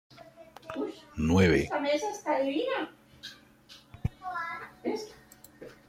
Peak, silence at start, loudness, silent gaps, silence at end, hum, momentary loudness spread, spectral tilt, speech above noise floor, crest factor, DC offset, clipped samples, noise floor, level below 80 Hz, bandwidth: -12 dBFS; 0.1 s; -30 LUFS; none; 0.15 s; none; 24 LU; -6 dB/octave; 28 dB; 20 dB; under 0.1%; under 0.1%; -56 dBFS; -52 dBFS; 16.5 kHz